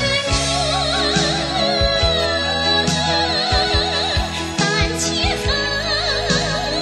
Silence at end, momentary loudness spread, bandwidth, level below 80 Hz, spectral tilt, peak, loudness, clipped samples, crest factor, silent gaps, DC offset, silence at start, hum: 0 s; 3 LU; 12.5 kHz; -30 dBFS; -3 dB/octave; -4 dBFS; -17 LUFS; under 0.1%; 14 dB; none; under 0.1%; 0 s; none